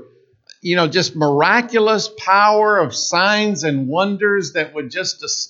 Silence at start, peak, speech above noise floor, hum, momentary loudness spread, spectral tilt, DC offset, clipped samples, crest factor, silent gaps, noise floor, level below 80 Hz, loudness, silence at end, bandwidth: 0 s; 0 dBFS; 33 dB; none; 9 LU; -3.5 dB/octave; under 0.1%; under 0.1%; 16 dB; none; -49 dBFS; -72 dBFS; -16 LUFS; 0.05 s; 8 kHz